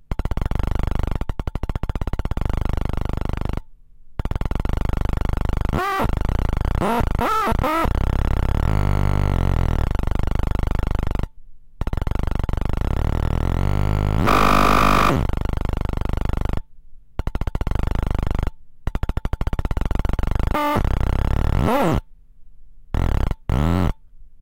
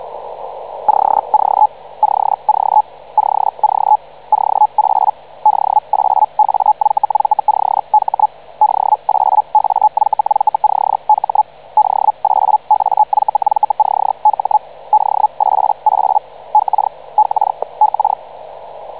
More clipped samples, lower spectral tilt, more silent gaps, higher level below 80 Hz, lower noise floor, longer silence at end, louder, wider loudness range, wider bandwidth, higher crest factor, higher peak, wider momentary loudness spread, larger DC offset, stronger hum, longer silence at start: neither; about the same, -6.5 dB/octave vs -6.5 dB/octave; neither; first, -24 dBFS vs -60 dBFS; first, -41 dBFS vs -33 dBFS; about the same, 0 s vs 0 s; second, -23 LUFS vs -14 LUFS; first, 8 LU vs 1 LU; first, 16.5 kHz vs 4 kHz; about the same, 16 dB vs 12 dB; about the same, -4 dBFS vs -2 dBFS; first, 9 LU vs 5 LU; first, 3% vs 0.7%; second, none vs 50 Hz at -55 dBFS; about the same, 0 s vs 0 s